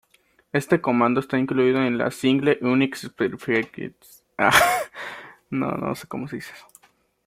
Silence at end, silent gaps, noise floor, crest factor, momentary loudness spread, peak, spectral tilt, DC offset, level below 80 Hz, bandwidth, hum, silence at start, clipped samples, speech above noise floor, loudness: 0.65 s; none; -62 dBFS; 22 dB; 18 LU; -2 dBFS; -5 dB/octave; under 0.1%; -58 dBFS; 16.5 kHz; none; 0.55 s; under 0.1%; 40 dB; -22 LUFS